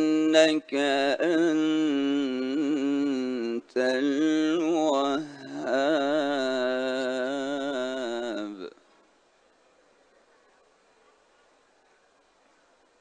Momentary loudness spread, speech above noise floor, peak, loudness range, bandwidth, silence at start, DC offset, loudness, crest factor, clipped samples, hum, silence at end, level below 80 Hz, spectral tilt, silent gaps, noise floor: 8 LU; 40 dB; -6 dBFS; 11 LU; 9.6 kHz; 0 s; under 0.1%; -26 LUFS; 22 dB; under 0.1%; none; 4.3 s; -76 dBFS; -4 dB/octave; none; -64 dBFS